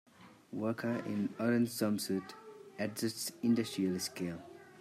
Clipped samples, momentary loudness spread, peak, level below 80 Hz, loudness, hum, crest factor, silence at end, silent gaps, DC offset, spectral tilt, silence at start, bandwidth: under 0.1%; 16 LU; -20 dBFS; -78 dBFS; -36 LUFS; none; 16 dB; 0 s; none; under 0.1%; -5 dB/octave; 0.2 s; 15.5 kHz